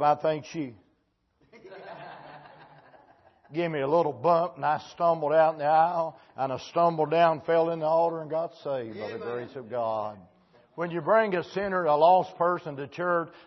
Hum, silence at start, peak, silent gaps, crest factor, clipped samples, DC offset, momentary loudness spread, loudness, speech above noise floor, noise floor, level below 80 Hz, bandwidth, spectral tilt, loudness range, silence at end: none; 0 s; -8 dBFS; none; 18 dB; under 0.1%; under 0.1%; 14 LU; -26 LUFS; 46 dB; -72 dBFS; -72 dBFS; 6.2 kHz; -7 dB/octave; 8 LU; 0.2 s